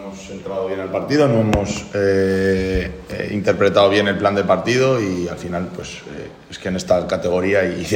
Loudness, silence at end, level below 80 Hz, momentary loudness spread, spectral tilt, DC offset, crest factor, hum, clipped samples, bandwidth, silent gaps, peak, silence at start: -18 LUFS; 0 s; -40 dBFS; 15 LU; -5.5 dB/octave; under 0.1%; 18 dB; none; under 0.1%; 16 kHz; none; 0 dBFS; 0 s